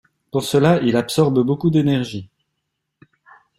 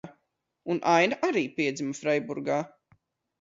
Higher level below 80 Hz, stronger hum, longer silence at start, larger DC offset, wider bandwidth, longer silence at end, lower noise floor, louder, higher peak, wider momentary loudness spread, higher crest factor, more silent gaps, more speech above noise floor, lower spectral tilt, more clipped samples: first, -54 dBFS vs -74 dBFS; neither; first, 0.35 s vs 0.05 s; neither; first, 16 kHz vs 7.8 kHz; first, 1.35 s vs 0.75 s; about the same, -76 dBFS vs -77 dBFS; first, -18 LUFS vs -27 LUFS; first, -2 dBFS vs -10 dBFS; about the same, 10 LU vs 10 LU; about the same, 18 dB vs 20 dB; neither; first, 59 dB vs 51 dB; first, -6.5 dB/octave vs -5 dB/octave; neither